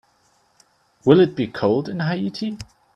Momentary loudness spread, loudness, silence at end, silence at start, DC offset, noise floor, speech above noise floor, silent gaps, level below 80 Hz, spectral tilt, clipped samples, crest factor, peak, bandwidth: 14 LU; -20 LUFS; 0.3 s; 1.05 s; under 0.1%; -61 dBFS; 42 dB; none; -56 dBFS; -7.5 dB/octave; under 0.1%; 20 dB; 0 dBFS; 9.4 kHz